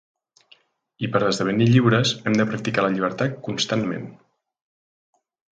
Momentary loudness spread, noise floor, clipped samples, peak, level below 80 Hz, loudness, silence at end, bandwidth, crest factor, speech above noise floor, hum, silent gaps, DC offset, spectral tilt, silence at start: 11 LU; -58 dBFS; under 0.1%; -2 dBFS; -58 dBFS; -21 LUFS; 1.4 s; 9.2 kHz; 20 dB; 37 dB; none; none; under 0.1%; -5.5 dB/octave; 1 s